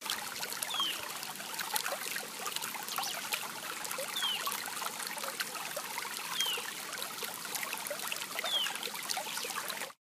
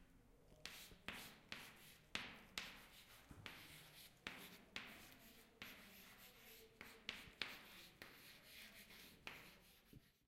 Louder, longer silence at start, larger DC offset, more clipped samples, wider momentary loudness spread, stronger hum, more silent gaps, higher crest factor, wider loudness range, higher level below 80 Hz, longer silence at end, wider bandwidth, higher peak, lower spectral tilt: first, -35 LUFS vs -56 LUFS; about the same, 0 s vs 0 s; neither; neither; second, 6 LU vs 12 LU; neither; neither; second, 30 dB vs 38 dB; about the same, 1 LU vs 3 LU; second, -84 dBFS vs -76 dBFS; first, 0.15 s vs 0 s; about the same, 16 kHz vs 16 kHz; first, -8 dBFS vs -22 dBFS; second, 0.5 dB/octave vs -2 dB/octave